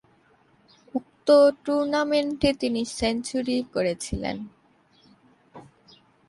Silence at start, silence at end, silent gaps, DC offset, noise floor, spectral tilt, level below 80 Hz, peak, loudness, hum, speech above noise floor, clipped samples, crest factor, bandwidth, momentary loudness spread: 0.95 s; 0.65 s; none; under 0.1%; -61 dBFS; -4.5 dB/octave; -50 dBFS; -6 dBFS; -24 LUFS; none; 38 dB; under 0.1%; 20 dB; 11.5 kHz; 16 LU